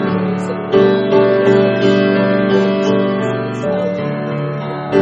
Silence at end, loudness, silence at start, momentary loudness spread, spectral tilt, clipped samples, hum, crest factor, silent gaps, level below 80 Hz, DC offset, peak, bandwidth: 0 s; -15 LUFS; 0 s; 8 LU; -7.5 dB/octave; under 0.1%; none; 14 dB; none; -52 dBFS; under 0.1%; 0 dBFS; 8 kHz